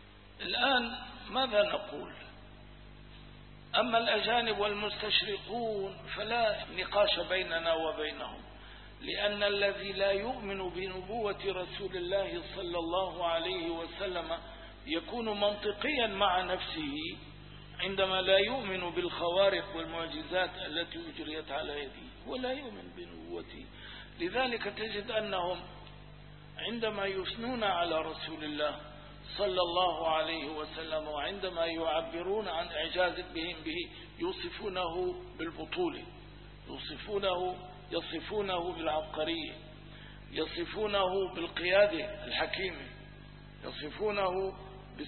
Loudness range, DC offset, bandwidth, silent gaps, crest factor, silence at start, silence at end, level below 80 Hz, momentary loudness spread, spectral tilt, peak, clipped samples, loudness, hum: 6 LU; under 0.1%; 4.3 kHz; none; 22 dB; 0 s; 0 s; -56 dBFS; 19 LU; -1.5 dB/octave; -12 dBFS; under 0.1%; -33 LUFS; 50 Hz at -55 dBFS